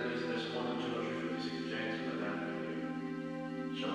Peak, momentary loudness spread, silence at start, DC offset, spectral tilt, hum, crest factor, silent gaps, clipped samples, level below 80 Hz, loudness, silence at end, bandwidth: -24 dBFS; 4 LU; 0 s; under 0.1%; -6 dB/octave; none; 14 dB; none; under 0.1%; -82 dBFS; -38 LUFS; 0 s; 10.5 kHz